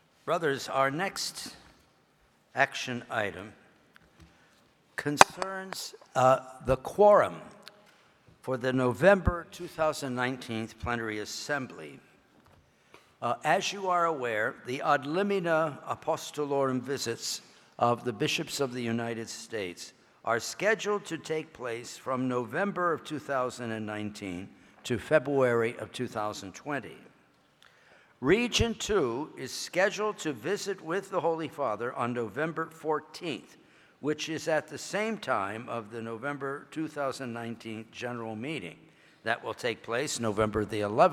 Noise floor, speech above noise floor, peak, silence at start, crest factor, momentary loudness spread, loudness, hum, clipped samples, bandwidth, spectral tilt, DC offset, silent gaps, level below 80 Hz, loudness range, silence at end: -66 dBFS; 36 dB; 0 dBFS; 0.25 s; 30 dB; 13 LU; -30 LUFS; none; under 0.1%; 18.5 kHz; -4 dB/octave; under 0.1%; none; -54 dBFS; 8 LU; 0 s